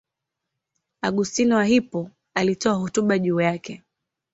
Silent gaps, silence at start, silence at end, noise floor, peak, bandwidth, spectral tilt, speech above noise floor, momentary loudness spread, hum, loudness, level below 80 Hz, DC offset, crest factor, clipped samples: none; 1.05 s; 0.6 s; -83 dBFS; -6 dBFS; 8 kHz; -5 dB/octave; 62 dB; 12 LU; none; -22 LUFS; -60 dBFS; under 0.1%; 18 dB; under 0.1%